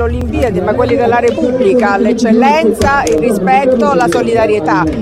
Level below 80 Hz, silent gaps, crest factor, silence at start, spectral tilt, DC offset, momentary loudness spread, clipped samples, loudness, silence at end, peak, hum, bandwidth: -28 dBFS; none; 10 dB; 0 s; -6 dB/octave; under 0.1%; 4 LU; under 0.1%; -11 LUFS; 0 s; 0 dBFS; none; 14.5 kHz